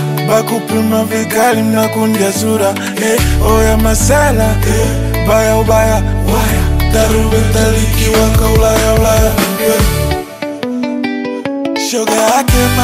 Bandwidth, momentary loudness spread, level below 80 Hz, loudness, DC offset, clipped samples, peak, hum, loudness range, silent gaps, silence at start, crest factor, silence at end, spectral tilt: 16.5 kHz; 7 LU; -18 dBFS; -12 LUFS; under 0.1%; under 0.1%; 0 dBFS; none; 3 LU; none; 0 s; 10 dB; 0 s; -5 dB/octave